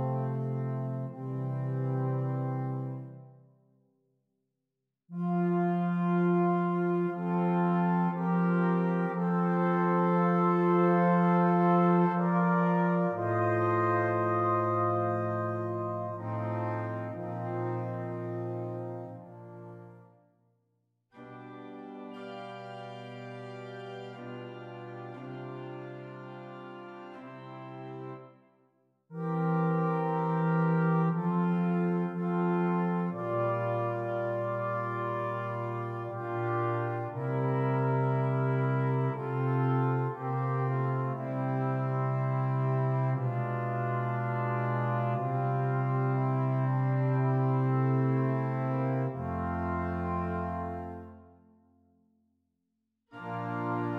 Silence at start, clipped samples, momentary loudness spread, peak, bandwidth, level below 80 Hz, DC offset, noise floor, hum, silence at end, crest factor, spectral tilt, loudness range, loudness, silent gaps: 0 s; under 0.1%; 17 LU; -14 dBFS; 4.4 kHz; -64 dBFS; under 0.1%; -86 dBFS; none; 0 s; 16 dB; -10.5 dB/octave; 17 LU; -30 LUFS; none